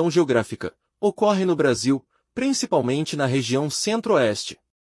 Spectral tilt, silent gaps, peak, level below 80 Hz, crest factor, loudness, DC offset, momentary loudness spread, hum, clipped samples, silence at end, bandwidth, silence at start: -5 dB/octave; none; -8 dBFS; -64 dBFS; 14 dB; -22 LUFS; under 0.1%; 11 LU; none; under 0.1%; 0.35 s; 12 kHz; 0 s